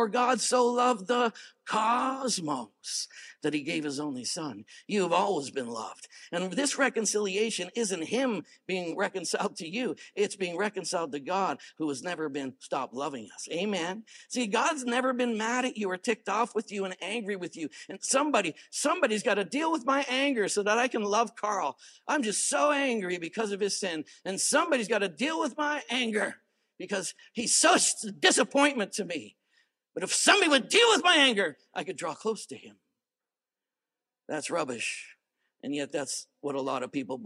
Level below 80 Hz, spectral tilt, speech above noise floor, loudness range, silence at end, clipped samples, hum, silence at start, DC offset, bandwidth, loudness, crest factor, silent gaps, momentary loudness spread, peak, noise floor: -90 dBFS; -2 dB/octave; over 61 dB; 9 LU; 0 s; under 0.1%; none; 0 s; under 0.1%; 15 kHz; -28 LUFS; 24 dB; none; 13 LU; -6 dBFS; under -90 dBFS